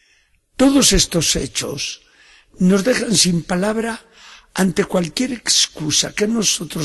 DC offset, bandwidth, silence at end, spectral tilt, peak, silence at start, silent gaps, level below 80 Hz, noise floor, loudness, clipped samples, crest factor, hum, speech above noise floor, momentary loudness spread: under 0.1%; 12.5 kHz; 0 s; -3 dB/octave; 0 dBFS; 0.6 s; none; -36 dBFS; -58 dBFS; -17 LUFS; under 0.1%; 18 dB; none; 41 dB; 13 LU